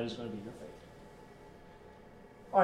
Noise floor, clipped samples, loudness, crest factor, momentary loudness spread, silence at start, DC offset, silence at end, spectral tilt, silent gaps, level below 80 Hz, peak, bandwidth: -55 dBFS; under 0.1%; -40 LUFS; 24 dB; 16 LU; 0 s; under 0.1%; 0 s; -6 dB/octave; none; -64 dBFS; -14 dBFS; 16 kHz